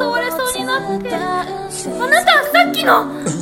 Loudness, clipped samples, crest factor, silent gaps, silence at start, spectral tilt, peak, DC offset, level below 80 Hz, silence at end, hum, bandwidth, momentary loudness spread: -15 LUFS; under 0.1%; 16 dB; none; 0 s; -3 dB/octave; 0 dBFS; under 0.1%; -50 dBFS; 0 s; none; 17 kHz; 11 LU